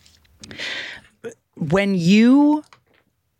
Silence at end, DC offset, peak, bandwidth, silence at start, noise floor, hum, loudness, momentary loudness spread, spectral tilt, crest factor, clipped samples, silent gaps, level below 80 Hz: 0.8 s; under 0.1%; -6 dBFS; 10.5 kHz; 0.5 s; -63 dBFS; none; -17 LUFS; 25 LU; -6.5 dB/octave; 14 dB; under 0.1%; none; -56 dBFS